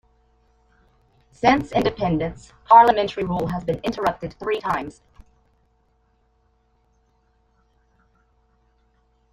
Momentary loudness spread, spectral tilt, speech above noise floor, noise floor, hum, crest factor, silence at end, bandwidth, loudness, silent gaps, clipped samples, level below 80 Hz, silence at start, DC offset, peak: 15 LU; -6.5 dB/octave; 44 dB; -64 dBFS; none; 22 dB; 4.4 s; 15 kHz; -20 LUFS; none; under 0.1%; -48 dBFS; 1.45 s; under 0.1%; -2 dBFS